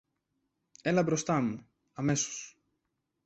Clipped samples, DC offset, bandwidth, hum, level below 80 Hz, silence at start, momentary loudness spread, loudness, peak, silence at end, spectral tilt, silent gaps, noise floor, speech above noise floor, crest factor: under 0.1%; under 0.1%; 8.4 kHz; none; -68 dBFS; 0.85 s; 17 LU; -31 LUFS; -16 dBFS; 0.75 s; -5 dB/octave; none; -82 dBFS; 52 dB; 18 dB